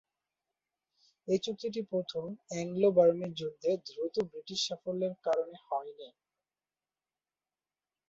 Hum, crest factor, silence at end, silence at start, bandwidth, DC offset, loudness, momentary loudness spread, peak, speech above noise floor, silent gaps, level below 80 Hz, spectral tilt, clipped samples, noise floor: none; 22 dB; 2 s; 1.25 s; 8 kHz; under 0.1%; -33 LUFS; 13 LU; -12 dBFS; over 58 dB; none; -76 dBFS; -5 dB/octave; under 0.1%; under -90 dBFS